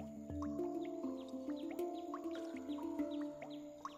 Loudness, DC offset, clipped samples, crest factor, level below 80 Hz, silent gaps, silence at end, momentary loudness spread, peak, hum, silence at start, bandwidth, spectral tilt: -45 LUFS; under 0.1%; under 0.1%; 14 dB; -70 dBFS; none; 0 s; 5 LU; -30 dBFS; none; 0 s; 15 kHz; -6.5 dB/octave